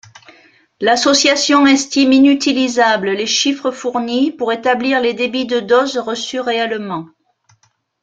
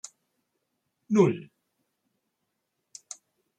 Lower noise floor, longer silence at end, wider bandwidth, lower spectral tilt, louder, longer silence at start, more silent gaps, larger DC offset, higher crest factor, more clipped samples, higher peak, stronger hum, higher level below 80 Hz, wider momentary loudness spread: second, -58 dBFS vs -80 dBFS; second, 0.95 s vs 2.2 s; second, 9.2 kHz vs 11 kHz; second, -2.5 dB/octave vs -7 dB/octave; first, -14 LUFS vs -25 LUFS; second, 0.8 s vs 1.1 s; neither; neither; second, 16 dB vs 24 dB; neither; first, 0 dBFS vs -8 dBFS; neither; first, -60 dBFS vs -76 dBFS; second, 9 LU vs 22 LU